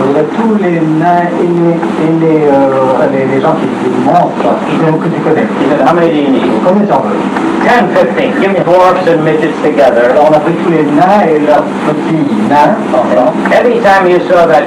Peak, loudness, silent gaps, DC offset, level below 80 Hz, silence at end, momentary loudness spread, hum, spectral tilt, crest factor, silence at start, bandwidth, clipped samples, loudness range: 0 dBFS; -8 LUFS; none; under 0.1%; -48 dBFS; 0 s; 4 LU; none; -7 dB/octave; 8 dB; 0 s; 12.5 kHz; 1%; 2 LU